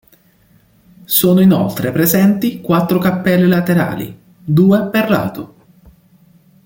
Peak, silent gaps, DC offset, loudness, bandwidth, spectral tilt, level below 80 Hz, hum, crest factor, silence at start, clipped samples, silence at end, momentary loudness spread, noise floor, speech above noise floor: 0 dBFS; none; under 0.1%; -13 LUFS; 17 kHz; -6 dB/octave; -50 dBFS; none; 14 dB; 1.1 s; under 0.1%; 1.2 s; 14 LU; -52 dBFS; 39 dB